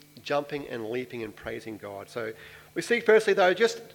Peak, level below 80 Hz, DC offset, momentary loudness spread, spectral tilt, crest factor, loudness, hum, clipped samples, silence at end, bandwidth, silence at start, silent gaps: -8 dBFS; -64 dBFS; under 0.1%; 17 LU; -4 dB/octave; 20 dB; -27 LUFS; none; under 0.1%; 0.05 s; 18 kHz; 0.15 s; none